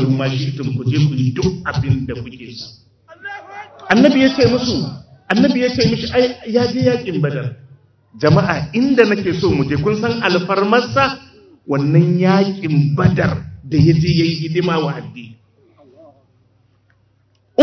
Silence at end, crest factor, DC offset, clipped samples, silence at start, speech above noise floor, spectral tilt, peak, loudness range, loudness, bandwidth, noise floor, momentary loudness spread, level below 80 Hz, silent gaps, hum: 0 s; 16 dB; under 0.1%; under 0.1%; 0 s; 43 dB; -7 dB/octave; 0 dBFS; 5 LU; -16 LUFS; 6.4 kHz; -58 dBFS; 18 LU; -40 dBFS; none; none